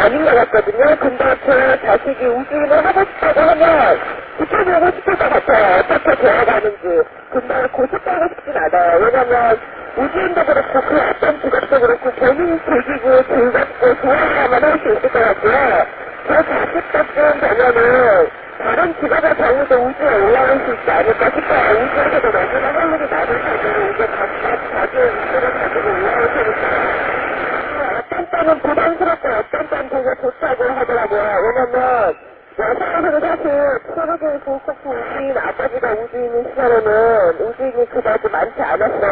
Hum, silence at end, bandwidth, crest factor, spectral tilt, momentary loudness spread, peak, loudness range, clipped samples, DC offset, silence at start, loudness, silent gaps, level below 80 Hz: none; 0 s; 4 kHz; 14 dB; -8.5 dB/octave; 8 LU; -2 dBFS; 4 LU; under 0.1%; under 0.1%; 0 s; -15 LUFS; none; -42 dBFS